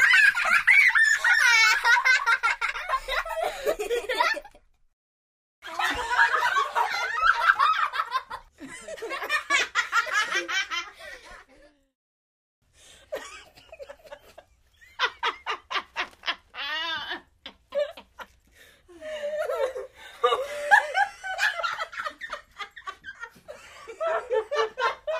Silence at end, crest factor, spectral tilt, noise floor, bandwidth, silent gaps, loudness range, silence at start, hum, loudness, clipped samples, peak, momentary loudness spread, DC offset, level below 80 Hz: 0 s; 24 dB; 0.5 dB/octave; -58 dBFS; 15.5 kHz; 4.93-5.62 s, 11.95-12.62 s; 13 LU; 0 s; none; -23 LUFS; under 0.1%; -4 dBFS; 23 LU; under 0.1%; -58 dBFS